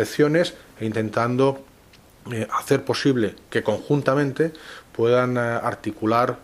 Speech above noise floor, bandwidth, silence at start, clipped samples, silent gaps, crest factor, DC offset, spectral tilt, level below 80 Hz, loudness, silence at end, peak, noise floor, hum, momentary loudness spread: 29 dB; 15.5 kHz; 0 s; under 0.1%; none; 20 dB; under 0.1%; -6 dB/octave; -58 dBFS; -22 LUFS; 0.05 s; -2 dBFS; -51 dBFS; none; 9 LU